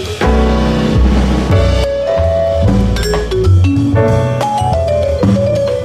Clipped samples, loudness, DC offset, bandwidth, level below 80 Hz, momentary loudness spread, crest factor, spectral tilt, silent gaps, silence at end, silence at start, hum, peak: under 0.1%; -12 LUFS; under 0.1%; 13.5 kHz; -18 dBFS; 3 LU; 10 dB; -7 dB/octave; none; 0 s; 0 s; none; 0 dBFS